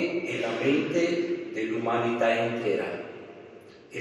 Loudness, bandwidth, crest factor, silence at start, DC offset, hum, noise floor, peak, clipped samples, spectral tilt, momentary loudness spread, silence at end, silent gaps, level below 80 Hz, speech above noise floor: -27 LUFS; 9.8 kHz; 16 dB; 0 s; under 0.1%; none; -49 dBFS; -12 dBFS; under 0.1%; -5.5 dB/octave; 18 LU; 0 s; none; -74 dBFS; 22 dB